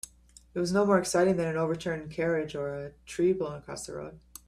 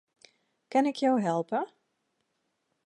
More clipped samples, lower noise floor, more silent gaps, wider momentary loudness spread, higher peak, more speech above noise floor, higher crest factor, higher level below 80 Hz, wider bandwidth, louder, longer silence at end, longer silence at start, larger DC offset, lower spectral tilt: neither; second, -55 dBFS vs -79 dBFS; neither; first, 15 LU vs 7 LU; about the same, -12 dBFS vs -14 dBFS; second, 27 dB vs 52 dB; about the same, 18 dB vs 18 dB; first, -58 dBFS vs -86 dBFS; first, 15 kHz vs 11 kHz; about the same, -29 LUFS vs -28 LUFS; second, 0.3 s vs 1.2 s; second, 0.55 s vs 0.7 s; neither; about the same, -5.5 dB/octave vs -6 dB/octave